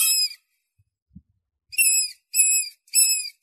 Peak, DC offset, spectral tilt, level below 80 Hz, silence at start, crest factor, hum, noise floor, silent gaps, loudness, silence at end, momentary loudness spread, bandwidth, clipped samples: -4 dBFS; under 0.1%; 5.5 dB/octave; -70 dBFS; 0 s; 20 dB; none; -70 dBFS; 1.02-1.06 s; -19 LUFS; 0.15 s; 6 LU; 14 kHz; under 0.1%